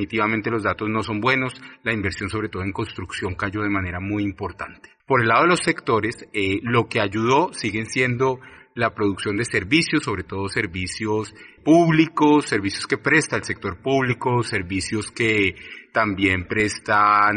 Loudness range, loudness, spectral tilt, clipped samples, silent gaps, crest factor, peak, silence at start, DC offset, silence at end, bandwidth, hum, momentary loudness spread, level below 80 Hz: 5 LU; -21 LUFS; -5 dB/octave; under 0.1%; none; 18 dB; -4 dBFS; 0 s; under 0.1%; 0 s; 10 kHz; none; 11 LU; -54 dBFS